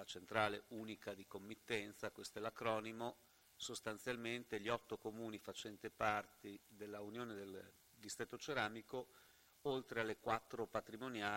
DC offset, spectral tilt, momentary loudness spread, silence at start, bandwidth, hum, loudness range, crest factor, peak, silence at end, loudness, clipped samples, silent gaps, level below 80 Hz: under 0.1%; -4 dB/octave; 13 LU; 0 s; 16 kHz; none; 2 LU; 26 dB; -20 dBFS; 0 s; -46 LUFS; under 0.1%; none; -78 dBFS